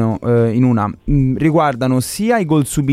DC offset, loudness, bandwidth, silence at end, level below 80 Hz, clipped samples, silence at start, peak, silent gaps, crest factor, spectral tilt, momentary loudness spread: under 0.1%; -15 LUFS; 15.5 kHz; 0 s; -32 dBFS; under 0.1%; 0 s; -2 dBFS; none; 12 dB; -7 dB/octave; 3 LU